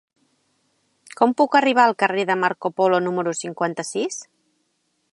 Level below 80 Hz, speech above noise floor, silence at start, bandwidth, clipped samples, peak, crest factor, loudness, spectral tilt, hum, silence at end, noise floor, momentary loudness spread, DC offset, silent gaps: -76 dBFS; 50 dB; 1.2 s; 11.5 kHz; under 0.1%; -2 dBFS; 20 dB; -20 LUFS; -4 dB/octave; none; 0.9 s; -70 dBFS; 10 LU; under 0.1%; none